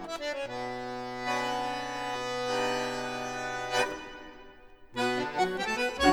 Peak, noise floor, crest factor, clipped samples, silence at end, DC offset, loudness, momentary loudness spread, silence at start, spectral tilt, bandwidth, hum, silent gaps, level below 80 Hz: -10 dBFS; -52 dBFS; 22 dB; under 0.1%; 0 s; under 0.1%; -32 LUFS; 10 LU; 0 s; -3.5 dB/octave; over 20 kHz; none; none; -56 dBFS